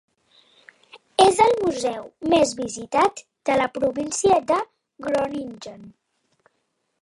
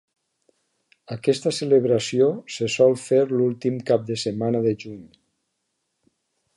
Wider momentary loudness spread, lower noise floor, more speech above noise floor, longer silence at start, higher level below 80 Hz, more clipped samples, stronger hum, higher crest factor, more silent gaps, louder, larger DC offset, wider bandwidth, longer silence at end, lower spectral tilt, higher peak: first, 15 LU vs 9 LU; about the same, -73 dBFS vs -76 dBFS; about the same, 52 dB vs 55 dB; second, 0.95 s vs 1.1 s; first, -56 dBFS vs -66 dBFS; neither; neither; about the same, 20 dB vs 18 dB; neither; about the same, -21 LUFS vs -22 LUFS; neither; about the same, 11.5 kHz vs 11.5 kHz; second, 1.1 s vs 1.5 s; second, -3.5 dB/octave vs -5.5 dB/octave; about the same, -2 dBFS vs -4 dBFS